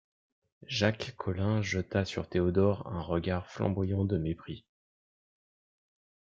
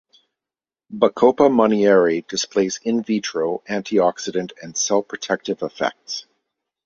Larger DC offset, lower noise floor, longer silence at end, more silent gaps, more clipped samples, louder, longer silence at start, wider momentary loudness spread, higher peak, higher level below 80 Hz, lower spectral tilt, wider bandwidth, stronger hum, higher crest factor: neither; about the same, under -90 dBFS vs under -90 dBFS; first, 1.75 s vs 0.65 s; neither; neither; second, -32 LUFS vs -20 LUFS; second, 0.7 s vs 0.9 s; second, 8 LU vs 12 LU; second, -12 dBFS vs -2 dBFS; about the same, -58 dBFS vs -62 dBFS; first, -6.5 dB/octave vs -4 dB/octave; about the same, 7.6 kHz vs 7.6 kHz; neither; about the same, 20 dB vs 18 dB